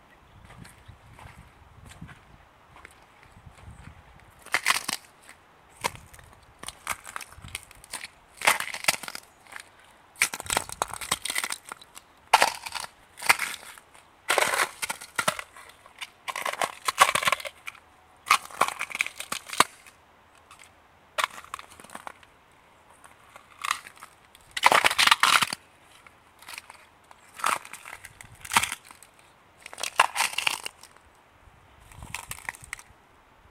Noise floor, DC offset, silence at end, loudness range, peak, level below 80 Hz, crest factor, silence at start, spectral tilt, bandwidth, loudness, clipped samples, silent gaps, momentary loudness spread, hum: -57 dBFS; under 0.1%; 0.85 s; 12 LU; -2 dBFS; -60 dBFS; 30 dB; 0.5 s; 0 dB/octave; 17 kHz; -26 LUFS; under 0.1%; none; 25 LU; none